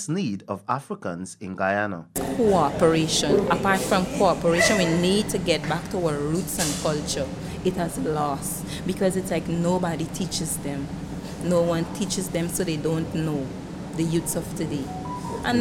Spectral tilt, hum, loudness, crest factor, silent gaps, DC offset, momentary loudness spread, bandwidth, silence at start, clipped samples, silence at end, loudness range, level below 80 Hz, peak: -4.5 dB/octave; none; -24 LUFS; 20 dB; none; under 0.1%; 11 LU; 17 kHz; 0 s; under 0.1%; 0 s; 6 LU; -46 dBFS; -4 dBFS